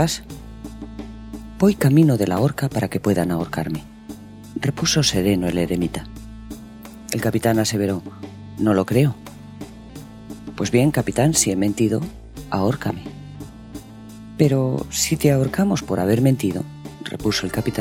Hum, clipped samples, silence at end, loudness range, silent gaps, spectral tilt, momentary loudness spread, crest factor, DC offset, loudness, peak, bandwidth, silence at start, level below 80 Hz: none; under 0.1%; 0 s; 3 LU; none; -5.5 dB/octave; 20 LU; 20 dB; under 0.1%; -20 LUFS; -2 dBFS; 17 kHz; 0 s; -44 dBFS